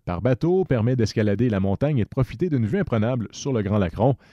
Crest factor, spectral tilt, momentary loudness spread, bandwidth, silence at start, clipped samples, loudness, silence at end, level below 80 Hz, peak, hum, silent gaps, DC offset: 14 dB; -8 dB/octave; 5 LU; 7.8 kHz; 0.05 s; under 0.1%; -23 LUFS; 0.15 s; -44 dBFS; -8 dBFS; none; none; under 0.1%